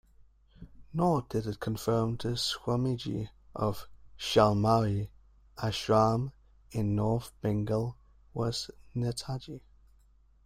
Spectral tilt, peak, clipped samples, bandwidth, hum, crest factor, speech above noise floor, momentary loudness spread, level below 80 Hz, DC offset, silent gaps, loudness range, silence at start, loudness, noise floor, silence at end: -6 dB/octave; -10 dBFS; under 0.1%; 15.5 kHz; none; 22 dB; 32 dB; 14 LU; -54 dBFS; under 0.1%; none; 4 LU; 0.6 s; -31 LUFS; -62 dBFS; 0.85 s